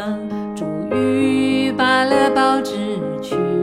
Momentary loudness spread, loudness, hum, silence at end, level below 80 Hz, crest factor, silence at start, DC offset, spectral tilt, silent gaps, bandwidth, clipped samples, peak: 10 LU; -18 LUFS; none; 0 s; -54 dBFS; 14 dB; 0 s; under 0.1%; -5.5 dB/octave; none; 13.5 kHz; under 0.1%; -4 dBFS